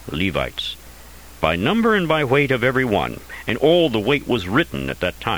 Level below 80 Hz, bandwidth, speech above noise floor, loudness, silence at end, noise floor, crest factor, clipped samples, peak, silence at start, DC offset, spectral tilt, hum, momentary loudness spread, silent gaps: -42 dBFS; over 20 kHz; 22 dB; -19 LUFS; 0 s; -42 dBFS; 20 dB; under 0.1%; 0 dBFS; 0 s; 0.4%; -6 dB/octave; none; 10 LU; none